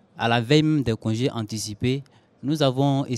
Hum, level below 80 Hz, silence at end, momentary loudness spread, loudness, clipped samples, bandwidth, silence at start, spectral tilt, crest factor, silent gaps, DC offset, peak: none; -52 dBFS; 0 s; 10 LU; -23 LUFS; under 0.1%; 14 kHz; 0.15 s; -6 dB/octave; 18 dB; none; under 0.1%; -4 dBFS